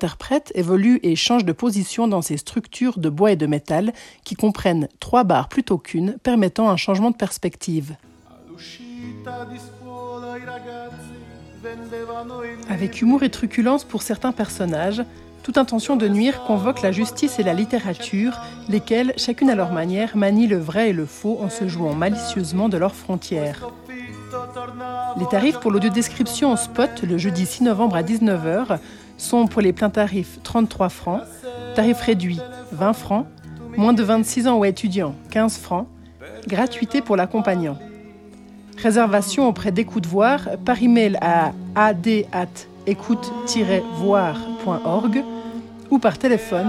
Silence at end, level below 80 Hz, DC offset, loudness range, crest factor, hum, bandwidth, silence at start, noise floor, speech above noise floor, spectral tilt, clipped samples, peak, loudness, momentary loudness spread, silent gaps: 0 s; -52 dBFS; under 0.1%; 5 LU; 18 dB; none; 14 kHz; 0 s; -45 dBFS; 25 dB; -5.5 dB/octave; under 0.1%; -2 dBFS; -20 LUFS; 16 LU; none